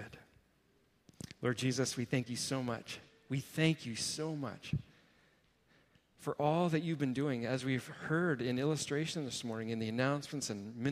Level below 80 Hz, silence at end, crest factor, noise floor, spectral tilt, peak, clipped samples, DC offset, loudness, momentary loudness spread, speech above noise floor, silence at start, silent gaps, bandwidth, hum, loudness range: -68 dBFS; 0 s; 22 dB; -72 dBFS; -5 dB/octave; -16 dBFS; under 0.1%; under 0.1%; -36 LUFS; 9 LU; 36 dB; 0 s; none; 15.5 kHz; none; 4 LU